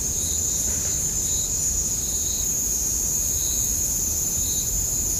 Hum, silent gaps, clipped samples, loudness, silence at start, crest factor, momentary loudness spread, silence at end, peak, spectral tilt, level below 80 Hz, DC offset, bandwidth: none; none; under 0.1%; -21 LUFS; 0 s; 12 dB; 1 LU; 0 s; -10 dBFS; -1.5 dB/octave; -36 dBFS; under 0.1%; 15.5 kHz